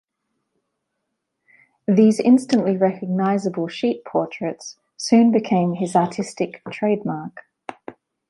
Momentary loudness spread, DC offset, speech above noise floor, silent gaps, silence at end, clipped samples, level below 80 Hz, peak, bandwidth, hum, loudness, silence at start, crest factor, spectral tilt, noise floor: 19 LU; under 0.1%; 58 dB; none; 0.4 s; under 0.1%; -68 dBFS; -4 dBFS; 11.5 kHz; none; -20 LUFS; 1.9 s; 18 dB; -6.5 dB/octave; -77 dBFS